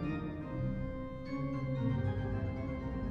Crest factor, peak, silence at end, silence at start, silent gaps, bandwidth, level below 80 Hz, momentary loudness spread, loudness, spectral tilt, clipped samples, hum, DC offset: 16 dB; -22 dBFS; 0 s; 0 s; none; 6.6 kHz; -46 dBFS; 6 LU; -38 LUFS; -9.5 dB/octave; under 0.1%; none; under 0.1%